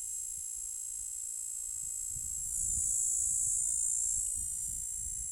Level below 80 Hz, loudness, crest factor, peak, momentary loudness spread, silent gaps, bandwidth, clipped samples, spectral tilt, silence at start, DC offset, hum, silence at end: -54 dBFS; -32 LUFS; 16 dB; -20 dBFS; 8 LU; none; over 20 kHz; under 0.1%; 0 dB/octave; 0 s; under 0.1%; none; 0 s